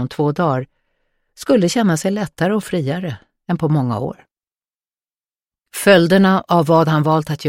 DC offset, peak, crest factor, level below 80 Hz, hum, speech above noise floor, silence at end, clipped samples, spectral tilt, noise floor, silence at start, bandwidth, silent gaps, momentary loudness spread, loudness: under 0.1%; 0 dBFS; 18 dB; -56 dBFS; none; over 74 dB; 0 s; under 0.1%; -6 dB/octave; under -90 dBFS; 0 s; 16.5 kHz; none; 15 LU; -16 LUFS